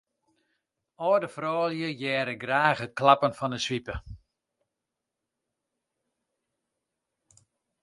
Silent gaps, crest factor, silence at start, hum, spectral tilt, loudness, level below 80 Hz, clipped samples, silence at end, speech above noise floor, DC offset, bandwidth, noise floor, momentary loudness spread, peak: none; 26 dB; 1 s; none; -5 dB/octave; -26 LUFS; -56 dBFS; under 0.1%; 3.65 s; 59 dB; under 0.1%; 11.5 kHz; -86 dBFS; 10 LU; -6 dBFS